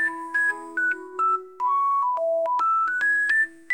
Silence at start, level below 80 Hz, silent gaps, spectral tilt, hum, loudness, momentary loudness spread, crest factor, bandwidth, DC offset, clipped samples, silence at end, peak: 0 s; -72 dBFS; none; -2 dB/octave; none; -23 LUFS; 5 LU; 10 dB; 16.5 kHz; under 0.1%; under 0.1%; 0 s; -14 dBFS